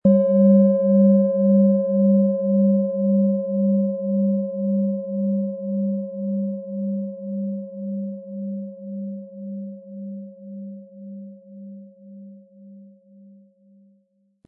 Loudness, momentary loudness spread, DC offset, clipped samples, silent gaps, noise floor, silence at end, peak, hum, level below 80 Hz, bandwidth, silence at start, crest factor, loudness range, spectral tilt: -20 LUFS; 22 LU; under 0.1%; under 0.1%; none; -64 dBFS; 1.6 s; -6 dBFS; none; -72 dBFS; 1.7 kHz; 0.05 s; 16 dB; 21 LU; -16 dB/octave